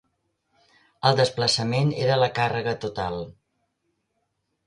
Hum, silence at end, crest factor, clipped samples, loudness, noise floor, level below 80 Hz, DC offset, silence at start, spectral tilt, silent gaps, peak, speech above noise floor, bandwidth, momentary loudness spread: none; 1.35 s; 24 dB; under 0.1%; -23 LUFS; -75 dBFS; -56 dBFS; under 0.1%; 1.05 s; -5 dB/octave; none; -2 dBFS; 52 dB; 11 kHz; 10 LU